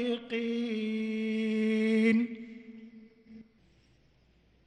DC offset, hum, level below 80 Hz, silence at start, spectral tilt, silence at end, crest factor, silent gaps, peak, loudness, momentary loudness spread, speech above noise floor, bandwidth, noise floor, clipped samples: under 0.1%; none; -72 dBFS; 0 s; -6.5 dB/octave; 1.25 s; 16 dB; none; -16 dBFS; -30 LUFS; 21 LU; 34 dB; 9.4 kHz; -65 dBFS; under 0.1%